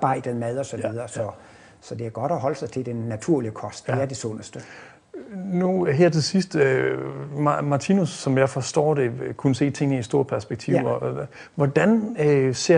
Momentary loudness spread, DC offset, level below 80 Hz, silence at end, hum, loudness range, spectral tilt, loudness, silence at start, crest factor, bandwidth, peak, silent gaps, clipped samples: 13 LU; under 0.1%; -60 dBFS; 0 s; none; 6 LU; -6 dB/octave; -23 LUFS; 0 s; 18 dB; 10 kHz; -4 dBFS; none; under 0.1%